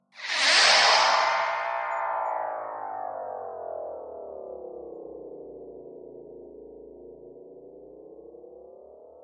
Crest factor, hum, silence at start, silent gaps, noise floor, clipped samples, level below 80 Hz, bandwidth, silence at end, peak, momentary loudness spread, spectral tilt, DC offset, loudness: 22 dB; none; 0.15 s; none; -49 dBFS; under 0.1%; -70 dBFS; 10.5 kHz; 0 s; -6 dBFS; 28 LU; 1 dB/octave; under 0.1%; -23 LUFS